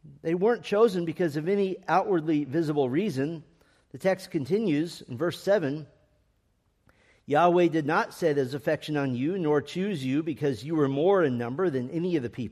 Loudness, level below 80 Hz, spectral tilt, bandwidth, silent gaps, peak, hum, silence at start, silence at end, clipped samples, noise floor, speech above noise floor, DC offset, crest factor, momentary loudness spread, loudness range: -27 LUFS; -68 dBFS; -7 dB/octave; 14 kHz; none; -8 dBFS; none; 0.05 s; 0 s; under 0.1%; -70 dBFS; 44 dB; under 0.1%; 18 dB; 7 LU; 4 LU